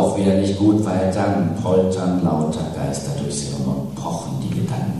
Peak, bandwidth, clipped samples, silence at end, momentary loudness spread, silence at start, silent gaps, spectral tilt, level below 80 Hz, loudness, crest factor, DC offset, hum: -4 dBFS; 13 kHz; under 0.1%; 0 s; 8 LU; 0 s; none; -6.5 dB/octave; -46 dBFS; -20 LUFS; 16 dB; 0.2%; none